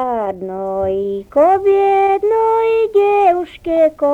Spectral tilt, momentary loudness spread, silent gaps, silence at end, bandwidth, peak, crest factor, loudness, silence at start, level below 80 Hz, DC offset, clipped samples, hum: -7 dB/octave; 9 LU; none; 0 s; 8 kHz; -2 dBFS; 12 dB; -15 LUFS; 0 s; -48 dBFS; under 0.1%; under 0.1%; none